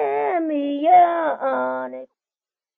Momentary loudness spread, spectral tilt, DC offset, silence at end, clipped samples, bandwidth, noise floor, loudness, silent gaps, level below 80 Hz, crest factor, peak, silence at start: 15 LU; -2.5 dB/octave; under 0.1%; 0.75 s; under 0.1%; 3.9 kHz; under -90 dBFS; -19 LUFS; none; -72 dBFS; 14 dB; -6 dBFS; 0 s